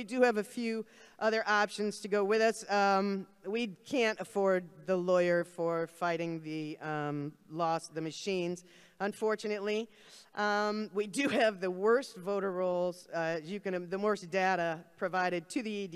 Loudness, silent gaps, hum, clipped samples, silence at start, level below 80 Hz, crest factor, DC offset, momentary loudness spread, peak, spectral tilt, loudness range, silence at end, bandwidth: -33 LUFS; none; none; under 0.1%; 0 s; -82 dBFS; 18 dB; under 0.1%; 9 LU; -14 dBFS; -5 dB/octave; 5 LU; 0 s; 14 kHz